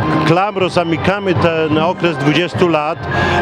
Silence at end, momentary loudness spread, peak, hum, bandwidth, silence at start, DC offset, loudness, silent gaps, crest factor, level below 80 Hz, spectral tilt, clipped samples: 0 s; 2 LU; 0 dBFS; none; 11.5 kHz; 0 s; under 0.1%; -14 LUFS; none; 14 dB; -40 dBFS; -6.5 dB/octave; under 0.1%